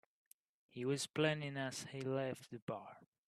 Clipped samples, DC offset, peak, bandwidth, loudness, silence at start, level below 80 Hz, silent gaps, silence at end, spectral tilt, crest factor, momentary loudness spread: under 0.1%; under 0.1%; -20 dBFS; 13 kHz; -41 LUFS; 0.75 s; -82 dBFS; 2.62-2.67 s; 0.25 s; -4.5 dB/octave; 22 dB; 12 LU